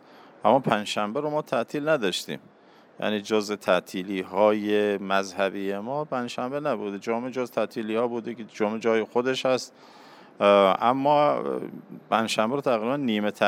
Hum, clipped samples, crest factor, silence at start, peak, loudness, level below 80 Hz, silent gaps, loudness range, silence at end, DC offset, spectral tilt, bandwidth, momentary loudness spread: none; under 0.1%; 22 dB; 0.45 s; -4 dBFS; -25 LUFS; -78 dBFS; none; 5 LU; 0 s; under 0.1%; -5 dB/octave; 16 kHz; 10 LU